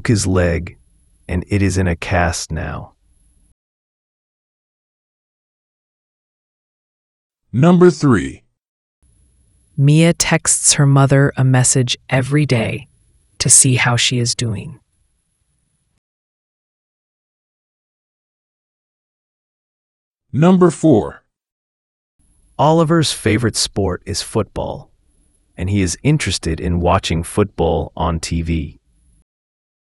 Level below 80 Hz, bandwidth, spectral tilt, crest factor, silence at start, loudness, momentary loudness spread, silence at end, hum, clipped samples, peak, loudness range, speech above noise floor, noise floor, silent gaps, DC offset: -40 dBFS; 12 kHz; -4.5 dB/octave; 18 dB; 0.05 s; -15 LUFS; 14 LU; 1.25 s; none; under 0.1%; 0 dBFS; 8 LU; 51 dB; -65 dBFS; 3.52-7.30 s, 8.68-9.02 s, 15.98-20.15 s, 21.52-22.19 s; under 0.1%